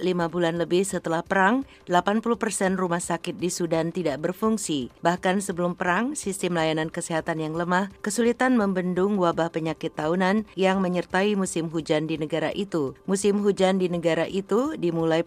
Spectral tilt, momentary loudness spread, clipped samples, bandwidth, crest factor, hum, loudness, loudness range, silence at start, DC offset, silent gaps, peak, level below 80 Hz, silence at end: -5 dB/octave; 6 LU; under 0.1%; 15.5 kHz; 18 dB; none; -25 LUFS; 2 LU; 0 s; under 0.1%; none; -6 dBFS; -58 dBFS; 0 s